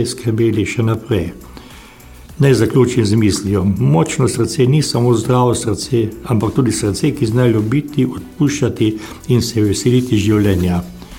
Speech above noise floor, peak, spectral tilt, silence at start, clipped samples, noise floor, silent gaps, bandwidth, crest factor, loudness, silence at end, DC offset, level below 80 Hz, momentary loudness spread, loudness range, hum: 24 dB; -2 dBFS; -6 dB/octave; 0 s; under 0.1%; -38 dBFS; none; 16.5 kHz; 14 dB; -15 LUFS; 0 s; under 0.1%; -40 dBFS; 5 LU; 2 LU; none